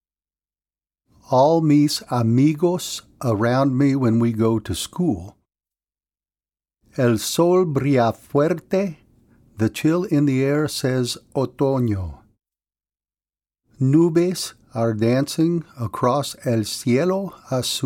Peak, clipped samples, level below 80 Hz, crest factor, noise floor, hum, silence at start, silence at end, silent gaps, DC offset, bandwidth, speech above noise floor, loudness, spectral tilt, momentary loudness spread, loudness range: -6 dBFS; under 0.1%; -52 dBFS; 16 dB; under -90 dBFS; none; 1.3 s; 0 s; none; under 0.1%; 17 kHz; over 71 dB; -20 LUFS; -6 dB/octave; 9 LU; 4 LU